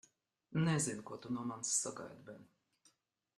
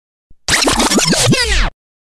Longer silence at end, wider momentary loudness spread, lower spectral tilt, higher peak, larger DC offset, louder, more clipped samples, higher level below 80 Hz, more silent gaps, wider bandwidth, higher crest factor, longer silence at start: first, 0.95 s vs 0.45 s; first, 20 LU vs 9 LU; first, -4 dB/octave vs -2.5 dB/octave; second, -22 dBFS vs -2 dBFS; neither; second, -38 LUFS vs -12 LUFS; neither; second, -76 dBFS vs -24 dBFS; neither; second, 12.5 kHz vs 16 kHz; first, 20 dB vs 14 dB; first, 0.5 s vs 0.3 s